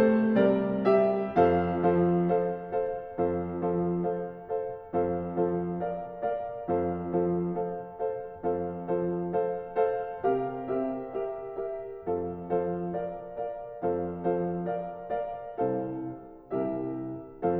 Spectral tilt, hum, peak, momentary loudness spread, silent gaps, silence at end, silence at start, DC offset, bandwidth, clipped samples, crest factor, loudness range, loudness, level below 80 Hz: -11 dB/octave; none; -10 dBFS; 11 LU; none; 0 s; 0 s; under 0.1%; 5 kHz; under 0.1%; 20 dB; 6 LU; -30 LUFS; -58 dBFS